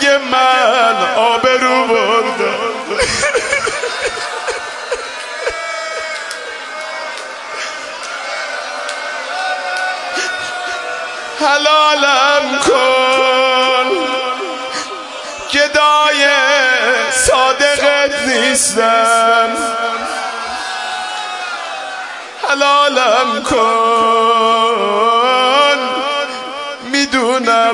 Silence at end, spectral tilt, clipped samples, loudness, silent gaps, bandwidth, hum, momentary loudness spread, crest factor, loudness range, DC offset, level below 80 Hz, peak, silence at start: 0 s; -1 dB/octave; under 0.1%; -13 LUFS; none; 11.5 kHz; none; 13 LU; 14 dB; 10 LU; under 0.1%; -46 dBFS; 0 dBFS; 0 s